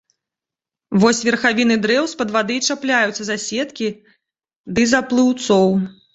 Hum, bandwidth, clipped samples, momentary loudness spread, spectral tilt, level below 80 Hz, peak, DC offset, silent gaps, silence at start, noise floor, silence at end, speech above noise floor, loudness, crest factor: none; 8.2 kHz; under 0.1%; 8 LU; -4 dB/octave; -54 dBFS; -2 dBFS; under 0.1%; 4.56-4.64 s; 0.9 s; -88 dBFS; 0.25 s; 70 dB; -17 LUFS; 18 dB